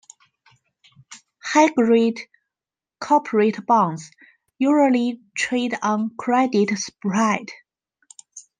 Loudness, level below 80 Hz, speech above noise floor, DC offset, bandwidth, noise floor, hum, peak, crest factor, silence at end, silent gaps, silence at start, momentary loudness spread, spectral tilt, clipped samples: -20 LUFS; -72 dBFS; 71 dB; under 0.1%; 9.8 kHz; -90 dBFS; none; -4 dBFS; 18 dB; 0.2 s; none; 1.1 s; 17 LU; -5 dB/octave; under 0.1%